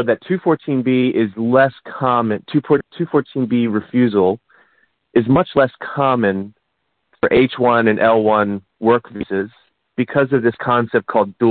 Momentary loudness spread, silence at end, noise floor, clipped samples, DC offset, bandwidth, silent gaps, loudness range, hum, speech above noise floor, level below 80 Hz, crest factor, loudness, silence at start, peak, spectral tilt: 8 LU; 0 s; -71 dBFS; under 0.1%; under 0.1%; 4.5 kHz; none; 2 LU; none; 55 dB; -54 dBFS; 14 dB; -17 LUFS; 0 s; -2 dBFS; -12 dB/octave